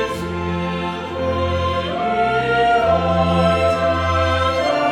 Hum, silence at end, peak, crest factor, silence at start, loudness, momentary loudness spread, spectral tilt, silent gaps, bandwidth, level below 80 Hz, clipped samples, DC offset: none; 0 s; -4 dBFS; 14 dB; 0 s; -18 LUFS; 7 LU; -6 dB/octave; none; 12 kHz; -36 dBFS; under 0.1%; under 0.1%